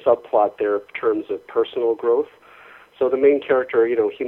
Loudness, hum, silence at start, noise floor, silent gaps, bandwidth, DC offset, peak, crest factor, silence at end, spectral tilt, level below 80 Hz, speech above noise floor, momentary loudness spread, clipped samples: -20 LUFS; none; 0.05 s; -46 dBFS; none; 4 kHz; under 0.1%; -4 dBFS; 16 dB; 0 s; -7.5 dB/octave; -64 dBFS; 27 dB; 7 LU; under 0.1%